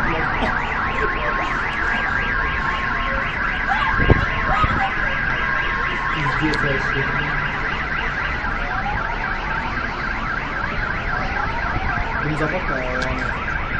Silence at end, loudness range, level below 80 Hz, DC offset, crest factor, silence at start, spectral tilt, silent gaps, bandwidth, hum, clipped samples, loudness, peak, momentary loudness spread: 0 s; 4 LU; -28 dBFS; under 0.1%; 20 dB; 0 s; -6 dB/octave; none; 8.6 kHz; none; under 0.1%; -21 LUFS; 0 dBFS; 5 LU